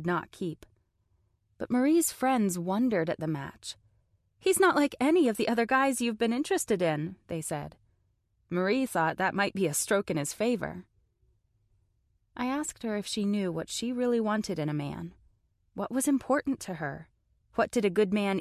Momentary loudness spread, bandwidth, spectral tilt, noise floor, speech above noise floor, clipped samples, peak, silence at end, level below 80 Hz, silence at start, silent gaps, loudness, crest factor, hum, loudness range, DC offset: 13 LU; 14.5 kHz; -4.5 dB/octave; -72 dBFS; 44 dB; under 0.1%; -12 dBFS; 0 s; -64 dBFS; 0 s; none; -29 LUFS; 18 dB; none; 6 LU; under 0.1%